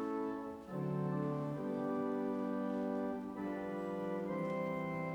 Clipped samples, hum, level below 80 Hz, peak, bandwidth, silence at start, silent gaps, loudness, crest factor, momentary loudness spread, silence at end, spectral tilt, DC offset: under 0.1%; none; -70 dBFS; -26 dBFS; over 20 kHz; 0 s; none; -39 LUFS; 12 dB; 4 LU; 0 s; -9 dB/octave; under 0.1%